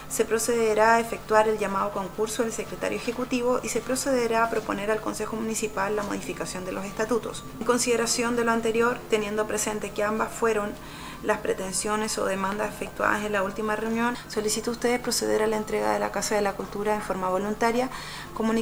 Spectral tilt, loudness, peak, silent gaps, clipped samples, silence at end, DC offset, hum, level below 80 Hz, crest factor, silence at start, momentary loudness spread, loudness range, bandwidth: -3.5 dB/octave; -26 LUFS; -4 dBFS; none; under 0.1%; 0 s; under 0.1%; none; -50 dBFS; 22 dB; 0 s; 7 LU; 3 LU; over 20 kHz